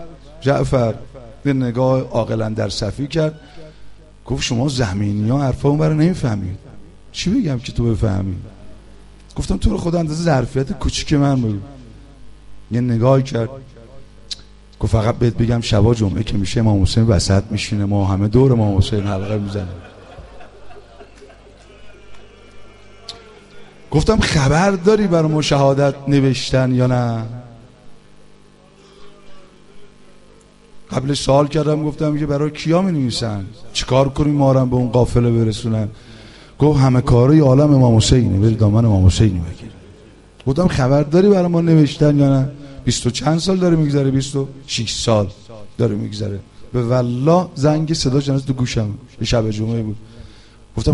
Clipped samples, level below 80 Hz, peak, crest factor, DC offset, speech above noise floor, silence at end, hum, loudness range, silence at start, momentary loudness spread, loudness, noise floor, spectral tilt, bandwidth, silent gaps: under 0.1%; -32 dBFS; 0 dBFS; 16 dB; under 0.1%; 31 dB; 0 s; 50 Hz at -40 dBFS; 7 LU; 0 s; 13 LU; -17 LUFS; -47 dBFS; -6.5 dB/octave; 11.5 kHz; none